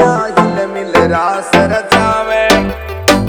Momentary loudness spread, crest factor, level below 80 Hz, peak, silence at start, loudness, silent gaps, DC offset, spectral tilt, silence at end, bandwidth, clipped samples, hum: 4 LU; 12 dB; -32 dBFS; 0 dBFS; 0 s; -12 LUFS; none; under 0.1%; -4.5 dB/octave; 0 s; over 20 kHz; 0.5%; none